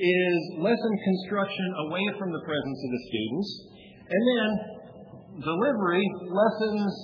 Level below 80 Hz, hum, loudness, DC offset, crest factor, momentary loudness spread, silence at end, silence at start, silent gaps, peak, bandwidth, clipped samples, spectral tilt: -66 dBFS; none; -27 LUFS; under 0.1%; 16 dB; 11 LU; 0 s; 0 s; none; -10 dBFS; 5.4 kHz; under 0.1%; -7.5 dB/octave